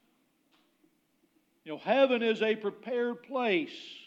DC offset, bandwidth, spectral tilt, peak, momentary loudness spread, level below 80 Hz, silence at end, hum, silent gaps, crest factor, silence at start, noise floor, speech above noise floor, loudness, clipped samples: under 0.1%; 7.6 kHz; -5.5 dB/octave; -12 dBFS; 13 LU; under -90 dBFS; 0.1 s; none; none; 22 dB; 1.65 s; -72 dBFS; 42 dB; -30 LUFS; under 0.1%